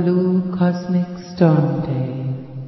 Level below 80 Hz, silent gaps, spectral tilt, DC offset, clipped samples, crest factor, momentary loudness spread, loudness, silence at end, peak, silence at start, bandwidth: -52 dBFS; none; -9.5 dB/octave; under 0.1%; under 0.1%; 16 dB; 11 LU; -19 LUFS; 0 s; -2 dBFS; 0 s; 6 kHz